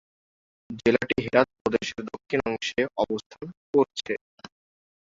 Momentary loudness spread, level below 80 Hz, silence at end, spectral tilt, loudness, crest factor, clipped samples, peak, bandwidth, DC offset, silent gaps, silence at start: 12 LU; -56 dBFS; 0.55 s; -5 dB/octave; -26 LUFS; 22 dB; under 0.1%; -4 dBFS; 7.8 kHz; under 0.1%; 1.61-1.65 s, 3.26-3.30 s, 3.57-3.73 s, 4.21-4.38 s; 0.7 s